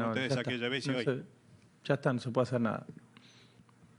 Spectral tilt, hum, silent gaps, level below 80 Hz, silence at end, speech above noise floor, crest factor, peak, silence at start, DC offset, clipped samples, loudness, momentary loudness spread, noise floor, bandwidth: -6 dB/octave; none; none; -78 dBFS; 1 s; 28 dB; 20 dB; -14 dBFS; 0 s; under 0.1%; under 0.1%; -33 LUFS; 12 LU; -61 dBFS; 11 kHz